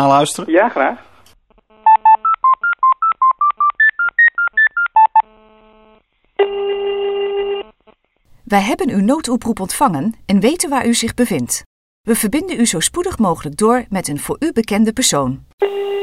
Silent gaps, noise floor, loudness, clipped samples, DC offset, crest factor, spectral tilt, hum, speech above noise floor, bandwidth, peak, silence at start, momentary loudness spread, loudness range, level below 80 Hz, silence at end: 11.66-12.04 s, 15.53-15.58 s; -54 dBFS; -15 LUFS; under 0.1%; under 0.1%; 16 dB; -3.5 dB/octave; none; 38 dB; 16 kHz; 0 dBFS; 0 s; 9 LU; 6 LU; -46 dBFS; 0 s